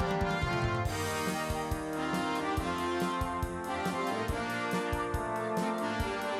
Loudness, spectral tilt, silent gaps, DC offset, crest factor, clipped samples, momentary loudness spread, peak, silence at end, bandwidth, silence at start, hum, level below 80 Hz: -33 LUFS; -5 dB/octave; none; under 0.1%; 14 dB; under 0.1%; 3 LU; -18 dBFS; 0 s; 16 kHz; 0 s; none; -44 dBFS